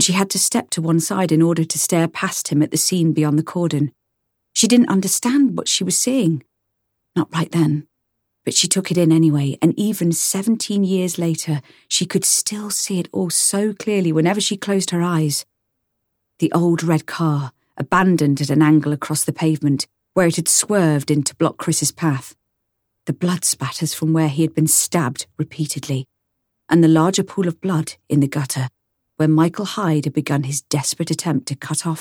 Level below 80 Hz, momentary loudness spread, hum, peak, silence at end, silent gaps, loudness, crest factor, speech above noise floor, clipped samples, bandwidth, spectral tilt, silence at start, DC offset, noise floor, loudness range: -62 dBFS; 9 LU; none; -2 dBFS; 0 s; none; -18 LUFS; 16 dB; 56 dB; under 0.1%; 17 kHz; -4.5 dB/octave; 0 s; under 0.1%; -74 dBFS; 3 LU